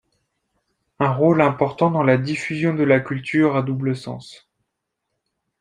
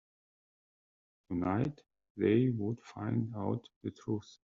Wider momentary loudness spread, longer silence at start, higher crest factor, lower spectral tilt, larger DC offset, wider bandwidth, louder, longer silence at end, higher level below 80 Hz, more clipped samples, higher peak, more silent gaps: second, 8 LU vs 11 LU; second, 1 s vs 1.3 s; about the same, 20 dB vs 20 dB; about the same, -7.5 dB/octave vs -8 dB/octave; neither; first, 10.5 kHz vs 7.4 kHz; first, -19 LUFS vs -35 LUFS; first, 1.25 s vs 0.2 s; first, -60 dBFS vs -70 dBFS; neither; first, -2 dBFS vs -16 dBFS; second, none vs 2.10-2.15 s, 3.76-3.81 s